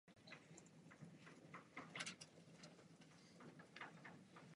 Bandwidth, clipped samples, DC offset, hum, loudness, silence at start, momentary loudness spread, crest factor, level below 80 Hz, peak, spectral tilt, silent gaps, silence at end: 11 kHz; under 0.1%; under 0.1%; none; -59 LUFS; 0.05 s; 14 LU; 28 dB; under -90 dBFS; -34 dBFS; -3 dB/octave; none; 0 s